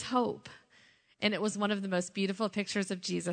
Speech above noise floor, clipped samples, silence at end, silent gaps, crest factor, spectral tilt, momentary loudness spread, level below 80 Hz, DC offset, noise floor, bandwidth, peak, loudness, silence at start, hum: 31 dB; under 0.1%; 0 s; none; 20 dB; -4.5 dB/octave; 4 LU; -76 dBFS; under 0.1%; -64 dBFS; 9.4 kHz; -12 dBFS; -33 LUFS; 0 s; none